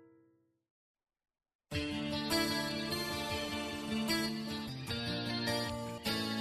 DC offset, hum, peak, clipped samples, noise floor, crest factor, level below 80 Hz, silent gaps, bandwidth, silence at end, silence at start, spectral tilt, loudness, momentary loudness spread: under 0.1%; none; -20 dBFS; under 0.1%; -72 dBFS; 18 dB; -62 dBFS; 0.71-0.94 s, 1.55-1.59 s; 13.5 kHz; 0 s; 0 s; -4 dB/octave; -36 LUFS; 7 LU